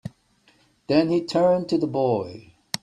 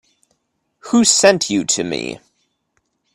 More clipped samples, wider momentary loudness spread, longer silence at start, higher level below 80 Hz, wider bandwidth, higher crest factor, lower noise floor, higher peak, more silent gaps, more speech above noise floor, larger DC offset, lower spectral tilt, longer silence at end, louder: neither; second, 13 LU vs 16 LU; second, 0.05 s vs 0.85 s; about the same, -62 dBFS vs -58 dBFS; about the same, 13.5 kHz vs 13.5 kHz; about the same, 20 dB vs 18 dB; second, -61 dBFS vs -69 dBFS; second, -4 dBFS vs 0 dBFS; neither; second, 40 dB vs 54 dB; neither; first, -6 dB/octave vs -2.5 dB/octave; second, 0.05 s vs 1 s; second, -22 LUFS vs -15 LUFS